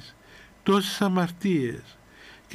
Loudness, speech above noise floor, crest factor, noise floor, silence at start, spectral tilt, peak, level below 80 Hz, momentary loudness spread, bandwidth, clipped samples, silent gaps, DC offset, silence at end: -25 LUFS; 27 dB; 18 dB; -51 dBFS; 0 s; -5.5 dB/octave; -10 dBFS; -60 dBFS; 14 LU; 15.5 kHz; under 0.1%; none; under 0.1%; 0 s